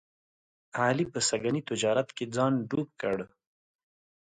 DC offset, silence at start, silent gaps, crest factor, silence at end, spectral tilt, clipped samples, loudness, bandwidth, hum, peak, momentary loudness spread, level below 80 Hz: under 0.1%; 0.75 s; none; 20 dB; 1.1 s; -4.5 dB/octave; under 0.1%; -30 LUFS; 9.6 kHz; none; -12 dBFS; 7 LU; -68 dBFS